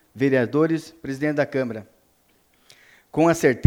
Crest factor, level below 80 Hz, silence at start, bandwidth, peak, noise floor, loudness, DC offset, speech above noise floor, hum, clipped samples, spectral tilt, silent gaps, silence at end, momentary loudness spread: 22 dB; -60 dBFS; 0.15 s; 17.5 kHz; 0 dBFS; -62 dBFS; -22 LUFS; under 0.1%; 42 dB; none; under 0.1%; -6.5 dB/octave; none; 0 s; 12 LU